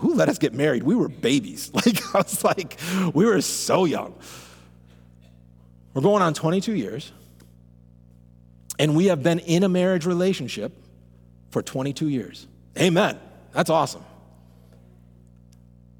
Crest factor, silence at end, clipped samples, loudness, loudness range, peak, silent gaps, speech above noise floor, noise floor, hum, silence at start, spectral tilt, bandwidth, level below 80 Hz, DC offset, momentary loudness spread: 20 dB; 1.95 s; under 0.1%; -22 LUFS; 4 LU; -4 dBFS; none; 29 dB; -51 dBFS; 60 Hz at -45 dBFS; 0 s; -5 dB/octave; 19 kHz; -58 dBFS; under 0.1%; 16 LU